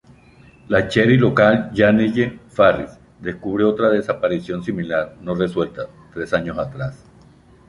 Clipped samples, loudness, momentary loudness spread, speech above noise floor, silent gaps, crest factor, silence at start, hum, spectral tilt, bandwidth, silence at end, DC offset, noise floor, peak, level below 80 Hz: under 0.1%; -18 LUFS; 15 LU; 30 dB; none; 18 dB; 0.7 s; none; -7.5 dB/octave; 11 kHz; 0.7 s; under 0.1%; -48 dBFS; -2 dBFS; -48 dBFS